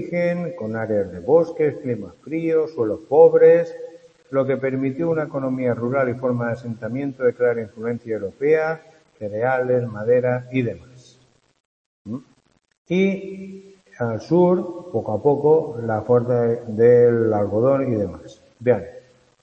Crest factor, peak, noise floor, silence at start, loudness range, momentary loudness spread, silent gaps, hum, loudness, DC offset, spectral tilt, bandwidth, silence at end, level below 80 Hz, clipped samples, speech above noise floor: 20 dB; -2 dBFS; -58 dBFS; 0 s; 7 LU; 15 LU; 11.60-12.05 s, 12.78-12.85 s; none; -20 LUFS; under 0.1%; -9 dB/octave; 6.6 kHz; 0.45 s; -60 dBFS; under 0.1%; 38 dB